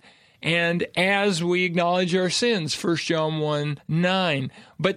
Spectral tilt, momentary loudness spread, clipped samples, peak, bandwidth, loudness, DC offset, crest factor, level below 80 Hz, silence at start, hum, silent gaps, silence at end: -4.5 dB/octave; 5 LU; under 0.1%; -6 dBFS; 14 kHz; -23 LUFS; under 0.1%; 18 dB; -64 dBFS; 0.4 s; none; none; 0 s